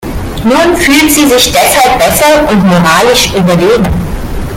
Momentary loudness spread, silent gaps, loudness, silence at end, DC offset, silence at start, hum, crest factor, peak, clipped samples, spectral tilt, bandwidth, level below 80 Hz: 8 LU; none; -6 LUFS; 0 s; under 0.1%; 0 s; none; 8 dB; 0 dBFS; 0.4%; -4 dB/octave; over 20 kHz; -22 dBFS